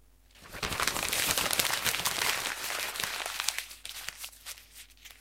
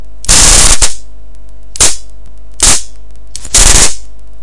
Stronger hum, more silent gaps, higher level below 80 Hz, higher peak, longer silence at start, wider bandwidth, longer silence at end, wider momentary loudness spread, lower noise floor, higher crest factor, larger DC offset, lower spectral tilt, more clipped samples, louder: neither; neither; second, -56 dBFS vs -16 dBFS; about the same, -2 dBFS vs 0 dBFS; first, 0.35 s vs 0 s; first, 17 kHz vs 12 kHz; about the same, 0.05 s vs 0 s; first, 18 LU vs 13 LU; first, -56 dBFS vs -33 dBFS; first, 32 dB vs 10 dB; second, under 0.1% vs 20%; about the same, 0 dB/octave vs -0.5 dB/octave; second, under 0.1% vs 6%; second, -30 LUFS vs -6 LUFS